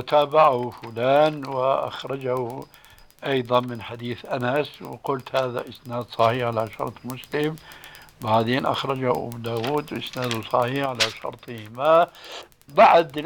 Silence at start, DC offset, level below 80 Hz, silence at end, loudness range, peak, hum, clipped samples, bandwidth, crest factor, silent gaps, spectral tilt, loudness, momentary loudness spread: 0 s; under 0.1%; -60 dBFS; 0 s; 4 LU; -4 dBFS; none; under 0.1%; 19 kHz; 18 dB; none; -5.5 dB/octave; -23 LUFS; 16 LU